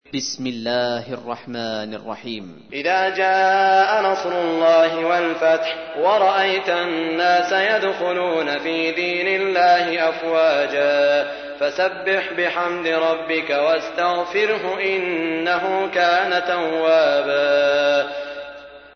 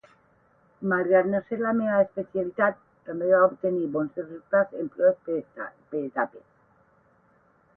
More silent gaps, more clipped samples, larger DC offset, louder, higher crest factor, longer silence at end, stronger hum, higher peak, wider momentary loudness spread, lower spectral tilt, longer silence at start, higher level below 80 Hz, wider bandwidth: neither; neither; neither; first, -19 LUFS vs -25 LUFS; second, 14 dB vs 20 dB; second, 0.15 s vs 1.4 s; neither; first, -4 dBFS vs -8 dBFS; about the same, 11 LU vs 12 LU; second, -3.5 dB/octave vs -11 dB/octave; second, 0.15 s vs 0.8 s; first, -62 dBFS vs -70 dBFS; first, 6.6 kHz vs 3.3 kHz